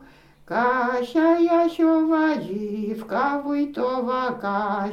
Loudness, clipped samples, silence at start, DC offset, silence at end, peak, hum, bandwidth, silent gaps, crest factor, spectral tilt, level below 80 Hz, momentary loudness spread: -22 LUFS; under 0.1%; 0 s; under 0.1%; 0 s; -8 dBFS; none; 7 kHz; none; 14 dB; -7 dB/octave; -60 dBFS; 9 LU